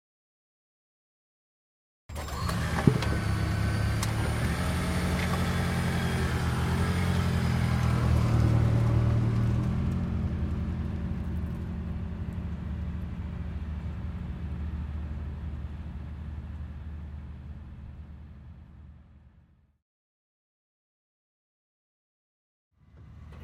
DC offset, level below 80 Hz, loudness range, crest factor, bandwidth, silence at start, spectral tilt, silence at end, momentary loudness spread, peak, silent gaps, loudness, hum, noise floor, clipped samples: under 0.1%; -40 dBFS; 16 LU; 26 dB; 16 kHz; 2.1 s; -6.5 dB/octave; 0 s; 17 LU; -4 dBFS; 19.82-22.71 s; -30 LUFS; none; -61 dBFS; under 0.1%